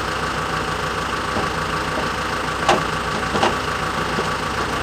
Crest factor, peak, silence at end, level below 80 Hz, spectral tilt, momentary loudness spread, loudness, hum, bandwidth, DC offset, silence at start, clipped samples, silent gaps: 20 dB; -2 dBFS; 0 s; -38 dBFS; -4 dB/octave; 4 LU; -21 LUFS; none; 16 kHz; under 0.1%; 0 s; under 0.1%; none